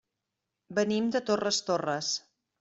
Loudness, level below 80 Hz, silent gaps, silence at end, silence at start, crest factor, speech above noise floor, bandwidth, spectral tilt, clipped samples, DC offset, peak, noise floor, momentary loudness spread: -29 LUFS; -72 dBFS; none; 0.4 s; 0.7 s; 18 dB; 57 dB; 8.2 kHz; -3.5 dB/octave; under 0.1%; under 0.1%; -12 dBFS; -86 dBFS; 5 LU